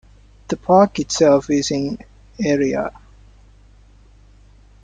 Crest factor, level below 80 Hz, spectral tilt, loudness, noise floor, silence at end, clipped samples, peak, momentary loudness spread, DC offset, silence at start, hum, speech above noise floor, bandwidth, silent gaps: 18 dB; -48 dBFS; -5 dB/octave; -18 LUFS; -48 dBFS; 1.95 s; under 0.1%; -2 dBFS; 14 LU; under 0.1%; 0.5 s; none; 31 dB; 9.4 kHz; none